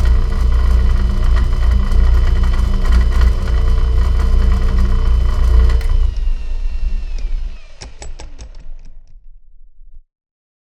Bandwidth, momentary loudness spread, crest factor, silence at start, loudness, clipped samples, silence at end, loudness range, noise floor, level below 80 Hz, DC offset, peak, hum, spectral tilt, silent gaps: 8.2 kHz; 19 LU; 14 dB; 0 s; -17 LUFS; under 0.1%; 0.7 s; 14 LU; -36 dBFS; -14 dBFS; under 0.1%; 0 dBFS; none; -7 dB/octave; none